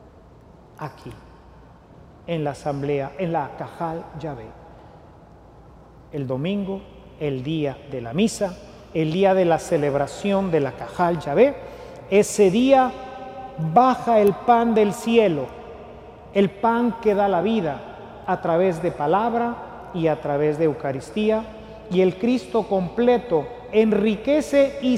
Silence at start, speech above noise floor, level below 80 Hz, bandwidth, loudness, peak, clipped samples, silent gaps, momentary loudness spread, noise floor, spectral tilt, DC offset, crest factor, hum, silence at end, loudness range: 0.8 s; 27 dB; -50 dBFS; 15.5 kHz; -21 LUFS; -4 dBFS; under 0.1%; none; 18 LU; -48 dBFS; -6.5 dB/octave; under 0.1%; 18 dB; none; 0 s; 11 LU